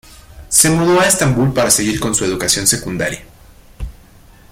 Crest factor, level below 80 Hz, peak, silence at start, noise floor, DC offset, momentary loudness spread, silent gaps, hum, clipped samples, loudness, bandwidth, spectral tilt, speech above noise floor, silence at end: 16 dB; -36 dBFS; 0 dBFS; 0.1 s; -43 dBFS; under 0.1%; 21 LU; none; none; under 0.1%; -13 LUFS; 16.5 kHz; -3.5 dB/octave; 29 dB; 0.6 s